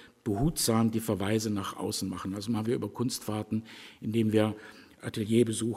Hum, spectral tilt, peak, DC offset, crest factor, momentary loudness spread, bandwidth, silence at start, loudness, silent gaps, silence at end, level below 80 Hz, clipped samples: none; -5.5 dB/octave; -12 dBFS; under 0.1%; 18 dB; 12 LU; 16 kHz; 0 s; -30 LUFS; none; 0 s; -54 dBFS; under 0.1%